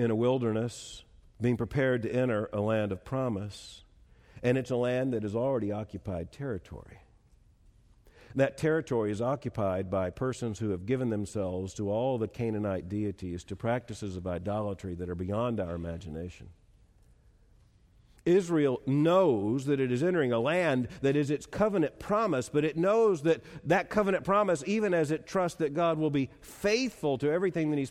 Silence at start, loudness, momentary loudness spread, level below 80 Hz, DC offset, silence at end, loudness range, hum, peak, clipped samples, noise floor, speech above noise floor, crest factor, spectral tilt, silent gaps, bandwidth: 0 s; -30 LUFS; 11 LU; -58 dBFS; under 0.1%; 0 s; 7 LU; none; -14 dBFS; under 0.1%; -61 dBFS; 32 dB; 16 dB; -6.5 dB/octave; none; 15 kHz